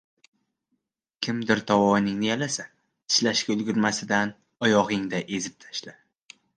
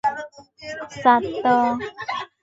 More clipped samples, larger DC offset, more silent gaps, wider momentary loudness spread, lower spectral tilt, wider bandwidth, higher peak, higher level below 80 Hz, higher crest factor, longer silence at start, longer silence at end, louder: neither; neither; neither; second, 12 LU vs 17 LU; second, -3.5 dB/octave vs -5 dB/octave; first, 10 kHz vs 7.8 kHz; second, -6 dBFS vs -2 dBFS; second, -64 dBFS vs -58 dBFS; about the same, 20 dB vs 20 dB; first, 1.2 s vs 0.05 s; first, 0.65 s vs 0.15 s; second, -25 LUFS vs -21 LUFS